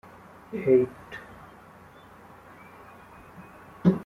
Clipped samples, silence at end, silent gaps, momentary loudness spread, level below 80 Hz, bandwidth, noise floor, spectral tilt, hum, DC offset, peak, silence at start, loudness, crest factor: under 0.1%; 0 s; none; 27 LU; -62 dBFS; 6.4 kHz; -50 dBFS; -9.5 dB/octave; none; under 0.1%; -8 dBFS; 0.5 s; -25 LUFS; 22 dB